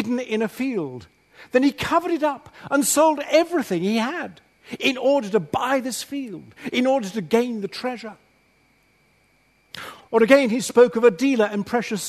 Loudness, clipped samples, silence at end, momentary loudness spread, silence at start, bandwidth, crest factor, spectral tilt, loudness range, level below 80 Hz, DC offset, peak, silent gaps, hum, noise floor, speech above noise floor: -21 LUFS; under 0.1%; 0 s; 18 LU; 0 s; 13.5 kHz; 22 dB; -4 dB/octave; 6 LU; -62 dBFS; under 0.1%; 0 dBFS; none; none; -61 dBFS; 40 dB